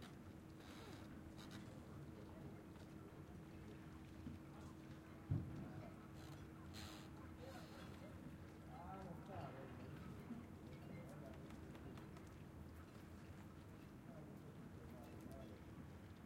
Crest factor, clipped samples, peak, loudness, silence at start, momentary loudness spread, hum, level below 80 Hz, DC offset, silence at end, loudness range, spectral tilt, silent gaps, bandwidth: 24 dB; under 0.1%; -32 dBFS; -56 LUFS; 0 s; 5 LU; none; -70 dBFS; under 0.1%; 0 s; 4 LU; -6.5 dB/octave; none; 16 kHz